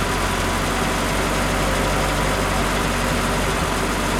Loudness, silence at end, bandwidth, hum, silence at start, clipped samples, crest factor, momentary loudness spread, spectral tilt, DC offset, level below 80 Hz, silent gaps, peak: -20 LUFS; 0 s; 16.5 kHz; none; 0 s; under 0.1%; 14 dB; 1 LU; -4 dB/octave; under 0.1%; -28 dBFS; none; -8 dBFS